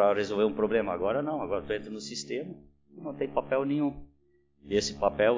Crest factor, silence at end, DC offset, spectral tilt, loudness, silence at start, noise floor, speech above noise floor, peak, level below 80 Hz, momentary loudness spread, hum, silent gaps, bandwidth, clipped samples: 20 dB; 0 s; under 0.1%; -5 dB/octave; -30 LUFS; 0 s; -68 dBFS; 39 dB; -10 dBFS; -56 dBFS; 13 LU; none; none; 7.6 kHz; under 0.1%